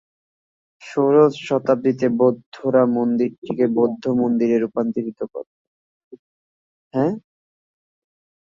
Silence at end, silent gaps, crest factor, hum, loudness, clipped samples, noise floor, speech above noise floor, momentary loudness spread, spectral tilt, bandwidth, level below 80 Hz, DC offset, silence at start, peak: 1.35 s; 2.46-2.52 s, 3.38-3.42 s, 5.47-6.11 s, 6.19-6.91 s; 18 dB; none; -20 LUFS; under 0.1%; under -90 dBFS; over 71 dB; 11 LU; -8 dB/octave; 7.6 kHz; -66 dBFS; under 0.1%; 0.8 s; -4 dBFS